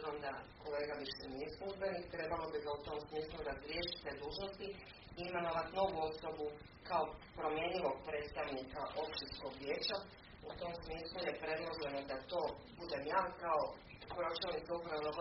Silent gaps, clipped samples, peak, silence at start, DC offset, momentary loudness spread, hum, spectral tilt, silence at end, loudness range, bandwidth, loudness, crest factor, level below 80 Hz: none; under 0.1%; -22 dBFS; 0 s; under 0.1%; 9 LU; none; -2.5 dB/octave; 0 s; 3 LU; 5.8 kHz; -43 LUFS; 20 dB; -62 dBFS